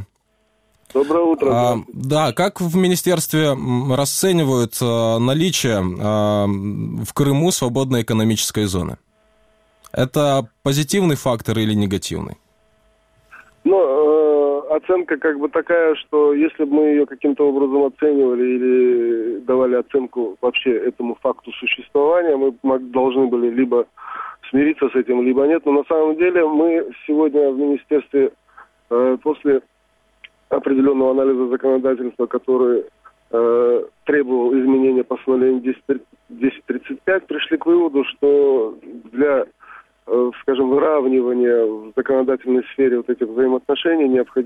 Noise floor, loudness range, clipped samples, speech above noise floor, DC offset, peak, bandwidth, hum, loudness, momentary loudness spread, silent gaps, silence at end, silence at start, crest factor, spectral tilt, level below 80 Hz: -64 dBFS; 3 LU; under 0.1%; 47 dB; under 0.1%; -6 dBFS; 16.5 kHz; none; -18 LUFS; 7 LU; none; 0 s; 0 s; 12 dB; -5.5 dB/octave; -54 dBFS